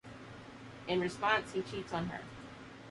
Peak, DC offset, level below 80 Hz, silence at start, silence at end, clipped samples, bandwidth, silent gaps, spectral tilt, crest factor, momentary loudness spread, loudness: -18 dBFS; under 0.1%; -64 dBFS; 0.05 s; 0 s; under 0.1%; 11.5 kHz; none; -5 dB/octave; 20 dB; 19 LU; -36 LUFS